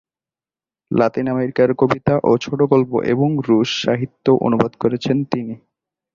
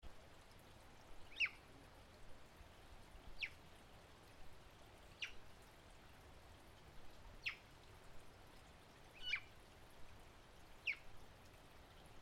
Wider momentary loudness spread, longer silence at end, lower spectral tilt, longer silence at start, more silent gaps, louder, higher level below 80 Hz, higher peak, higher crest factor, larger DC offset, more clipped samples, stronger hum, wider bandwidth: second, 5 LU vs 19 LU; first, 0.6 s vs 0 s; first, -7 dB/octave vs -2.5 dB/octave; first, 0.9 s vs 0 s; neither; first, -18 LUFS vs -47 LUFS; first, -52 dBFS vs -66 dBFS; first, -2 dBFS vs -30 dBFS; second, 16 dB vs 24 dB; neither; neither; neither; second, 7.4 kHz vs 16 kHz